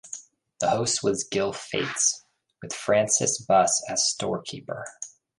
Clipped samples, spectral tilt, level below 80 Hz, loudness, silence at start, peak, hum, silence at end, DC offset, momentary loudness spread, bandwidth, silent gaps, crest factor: under 0.1%; -2.5 dB/octave; -64 dBFS; -24 LUFS; 0.05 s; -8 dBFS; none; 0.3 s; under 0.1%; 16 LU; 11.5 kHz; none; 20 dB